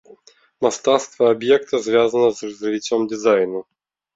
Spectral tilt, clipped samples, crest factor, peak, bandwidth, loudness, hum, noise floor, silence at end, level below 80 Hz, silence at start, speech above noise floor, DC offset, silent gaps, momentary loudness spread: -4 dB/octave; under 0.1%; 16 dB; -2 dBFS; 7.8 kHz; -19 LUFS; none; -50 dBFS; 0.55 s; -64 dBFS; 0.6 s; 32 dB; under 0.1%; none; 8 LU